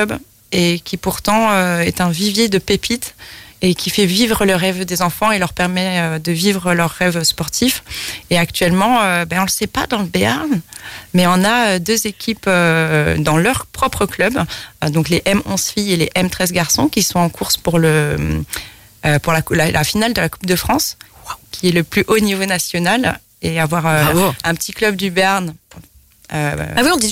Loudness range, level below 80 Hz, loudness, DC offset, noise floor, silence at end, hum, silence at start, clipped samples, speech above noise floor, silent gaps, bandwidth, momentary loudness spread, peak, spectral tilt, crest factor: 2 LU; -38 dBFS; -16 LUFS; under 0.1%; -45 dBFS; 0 s; none; 0 s; under 0.1%; 29 dB; none; 16.5 kHz; 8 LU; -2 dBFS; -4 dB/octave; 14 dB